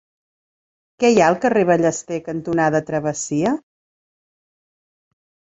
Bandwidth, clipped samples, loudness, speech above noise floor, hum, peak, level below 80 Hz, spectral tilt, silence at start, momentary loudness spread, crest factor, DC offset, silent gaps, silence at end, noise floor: 8.2 kHz; under 0.1%; -19 LUFS; over 72 dB; none; -2 dBFS; -58 dBFS; -5.5 dB/octave; 1 s; 11 LU; 20 dB; under 0.1%; none; 1.9 s; under -90 dBFS